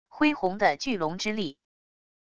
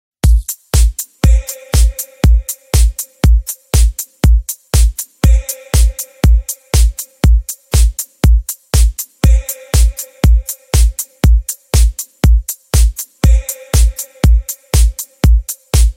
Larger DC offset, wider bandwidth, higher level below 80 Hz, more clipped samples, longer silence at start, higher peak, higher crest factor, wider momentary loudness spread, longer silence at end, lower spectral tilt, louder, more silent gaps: first, 0.5% vs under 0.1%; second, 8.2 kHz vs 16.5 kHz; second, -60 dBFS vs -12 dBFS; neither; second, 0.05 s vs 0.25 s; second, -8 dBFS vs 0 dBFS; first, 20 dB vs 12 dB; first, 7 LU vs 3 LU; first, 0.65 s vs 0.05 s; about the same, -4.5 dB/octave vs -4.5 dB/octave; second, -27 LUFS vs -14 LUFS; neither